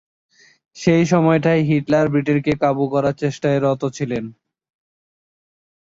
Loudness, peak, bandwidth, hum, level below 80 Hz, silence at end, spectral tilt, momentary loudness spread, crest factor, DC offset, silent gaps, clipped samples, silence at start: -18 LUFS; -4 dBFS; 7.8 kHz; none; -54 dBFS; 1.6 s; -7 dB/octave; 8 LU; 16 dB; under 0.1%; none; under 0.1%; 0.75 s